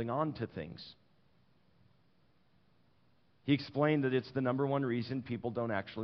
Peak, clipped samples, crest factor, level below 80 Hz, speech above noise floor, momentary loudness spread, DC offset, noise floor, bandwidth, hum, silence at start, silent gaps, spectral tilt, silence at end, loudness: -16 dBFS; under 0.1%; 20 dB; -72 dBFS; 38 dB; 14 LU; under 0.1%; -72 dBFS; 6 kHz; none; 0 s; none; -6 dB/octave; 0 s; -35 LUFS